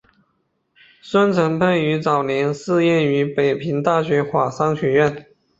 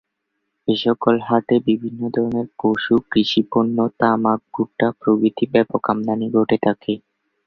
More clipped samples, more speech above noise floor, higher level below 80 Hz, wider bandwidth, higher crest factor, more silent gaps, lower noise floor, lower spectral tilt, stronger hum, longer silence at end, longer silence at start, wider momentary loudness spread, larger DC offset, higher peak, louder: neither; second, 50 dB vs 57 dB; about the same, -58 dBFS vs -58 dBFS; first, 8 kHz vs 6.6 kHz; about the same, 16 dB vs 18 dB; neither; second, -68 dBFS vs -75 dBFS; about the same, -7 dB/octave vs -7.5 dB/octave; neither; about the same, 0.4 s vs 0.5 s; first, 1.05 s vs 0.65 s; about the same, 4 LU vs 5 LU; neither; about the same, -2 dBFS vs -2 dBFS; about the same, -18 LUFS vs -19 LUFS